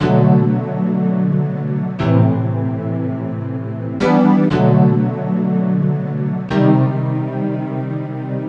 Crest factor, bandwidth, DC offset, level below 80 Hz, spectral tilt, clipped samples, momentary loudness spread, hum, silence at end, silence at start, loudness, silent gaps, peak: 14 dB; 6.8 kHz; under 0.1%; -48 dBFS; -10 dB/octave; under 0.1%; 11 LU; none; 0 s; 0 s; -17 LUFS; none; 0 dBFS